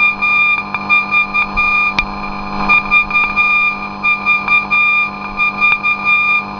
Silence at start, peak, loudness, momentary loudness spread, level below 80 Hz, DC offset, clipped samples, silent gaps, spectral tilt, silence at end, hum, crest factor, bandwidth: 0 s; 0 dBFS; -11 LUFS; 6 LU; -36 dBFS; under 0.1%; under 0.1%; none; -4 dB/octave; 0 s; 50 Hz at -30 dBFS; 14 dB; 5.4 kHz